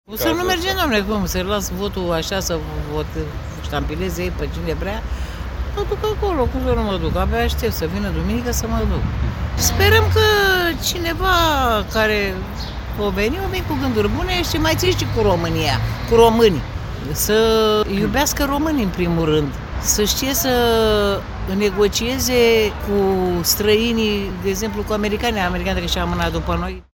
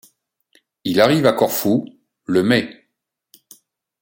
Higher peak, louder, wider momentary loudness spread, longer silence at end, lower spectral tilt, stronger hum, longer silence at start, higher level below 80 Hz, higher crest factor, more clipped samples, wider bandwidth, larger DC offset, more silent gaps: about the same, 0 dBFS vs 0 dBFS; about the same, -19 LUFS vs -17 LUFS; second, 10 LU vs 19 LU; second, 0.15 s vs 1.3 s; about the same, -4.5 dB/octave vs -5 dB/octave; neither; second, 0.1 s vs 0.85 s; first, -28 dBFS vs -60 dBFS; about the same, 18 dB vs 20 dB; neither; about the same, 17 kHz vs 17 kHz; neither; neither